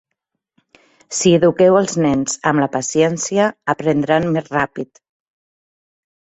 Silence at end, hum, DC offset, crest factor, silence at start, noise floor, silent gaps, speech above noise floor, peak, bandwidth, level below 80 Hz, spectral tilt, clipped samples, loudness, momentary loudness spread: 1.55 s; none; under 0.1%; 16 dB; 1.1 s; -77 dBFS; none; 61 dB; -2 dBFS; 8.2 kHz; -54 dBFS; -5 dB/octave; under 0.1%; -16 LUFS; 8 LU